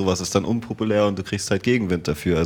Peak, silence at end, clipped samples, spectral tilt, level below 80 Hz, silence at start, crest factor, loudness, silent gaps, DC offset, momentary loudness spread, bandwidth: -4 dBFS; 0 s; under 0.1%; -5.5 dB/octave; -48 dBFS; 0 s; 18 dB; -22 LUFS; none; under 0.1%; 4 LU; 18 kHz